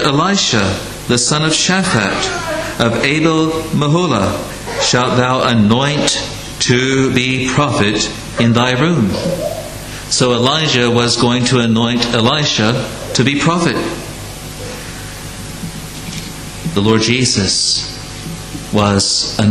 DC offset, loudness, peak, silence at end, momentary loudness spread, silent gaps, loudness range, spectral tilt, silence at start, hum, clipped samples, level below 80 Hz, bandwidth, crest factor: under 0.1%; -13 LUFS; 0 dBFS; 0 s; 14 LU; none; 5 LU; -4 dB/octave; 0 s; none; under 0.1%; -36 dBFS; 14.5 kHz; 14 dB